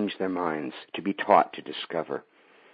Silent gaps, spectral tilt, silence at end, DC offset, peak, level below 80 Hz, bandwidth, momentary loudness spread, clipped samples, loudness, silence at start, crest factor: none; -9.5 dB/octave; 0.55 s; under 0.1%; -4 dBFS; -78 dBFS; 5 kHz; 14 LU; under 0.1%; -28 LUFS; 0 s; 24 dB